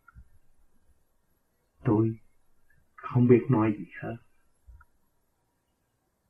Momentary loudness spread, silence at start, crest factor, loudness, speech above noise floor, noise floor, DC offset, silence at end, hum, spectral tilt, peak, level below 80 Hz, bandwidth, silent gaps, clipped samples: 22 LU; 0.2 s; 24 dB; -26 LUFS; 51 dB; -75 dBFS; under 0.1%; 2.15 s; none; -11.5 dB/octave; -8 dBFS; -60 dBFS; 3.4 kHz; none; under 0.1%